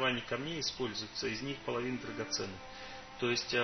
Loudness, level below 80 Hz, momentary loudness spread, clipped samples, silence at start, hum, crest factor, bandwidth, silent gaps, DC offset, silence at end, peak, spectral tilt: -37 LUFS; -62 dBFS; 12 LU; under 0.1%; 0 s; none; 20 dB; 6.4 kHz; none; under 0.1%; 0 s; -18 dBFS; -3.5 dB/octave